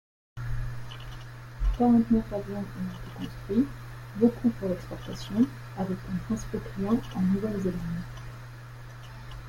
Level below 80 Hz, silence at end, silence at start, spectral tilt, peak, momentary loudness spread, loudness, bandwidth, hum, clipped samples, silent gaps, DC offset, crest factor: -40 dBFS; 0 s; 0.35 s; -7.5 dB/octave; -10 dBFS; 19 LU; -29 LUFS; 16.5 kHz; none; under 0.1%; none; under 0.1%; 20 dB